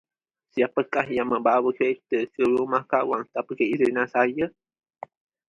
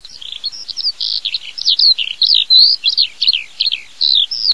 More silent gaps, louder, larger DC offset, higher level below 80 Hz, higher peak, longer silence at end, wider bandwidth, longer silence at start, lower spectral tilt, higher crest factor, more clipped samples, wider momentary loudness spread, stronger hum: neither; second, -24 LUFS vs -11 LUFS; second, under 0.1% vs 1%; second, -66 dBFS vs -60 dBFS; second, -6 dBFS vs 0 dBFS; first, 1 s vs 0 s; second, 7.2 kHz vs 11 kHz; first, 0.55 s vs 0.25 s; first, -7 dB/octave vs 3 dB/octave; first, 20 dB vs 14 dB; neither; second, 10 LU vs 15 LU; neither